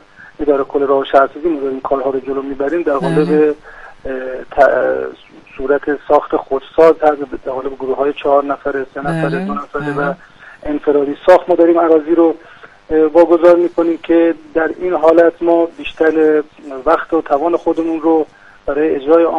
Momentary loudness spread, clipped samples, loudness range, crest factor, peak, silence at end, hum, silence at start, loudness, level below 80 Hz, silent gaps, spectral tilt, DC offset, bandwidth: 12 LU; 0.2%; 5 LU; 14 dB; 0 dBFS; 0 s; none; 0.2 s; -14 LUFS; -44 dBFS; none; -8 dB/octave; under 0.1%; 7.4 kHz